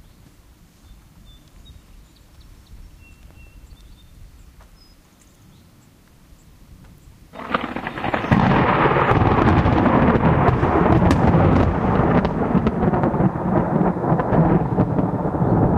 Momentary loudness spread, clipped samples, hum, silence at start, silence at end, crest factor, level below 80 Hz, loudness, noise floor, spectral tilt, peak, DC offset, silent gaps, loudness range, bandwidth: 8 LU; under 0.1%; none; 1.3 s; 0 s; 20 dB; -32 dBFS; -18 LUFS; -51 dBFS; -9 dB/octave; 0 dBFS; under 0.1%; none; 10 LU; 9.8 kHz